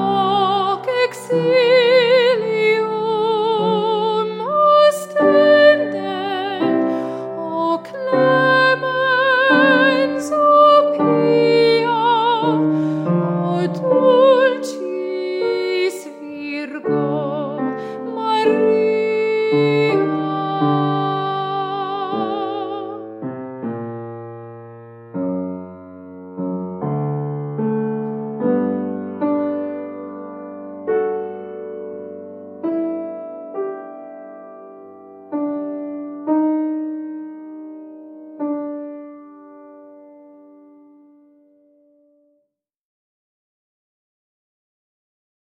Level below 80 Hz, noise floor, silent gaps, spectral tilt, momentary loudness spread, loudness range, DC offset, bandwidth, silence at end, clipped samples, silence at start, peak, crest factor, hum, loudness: -76 dBFS; -71 dBFS; none; -6 dB/octave; 20 LU; 14 LU; under 0.1%; 16 kHz; 5.55 s; under 0.1%; 0 s; -2 dBFS; 18 dB; none; -17 LUFS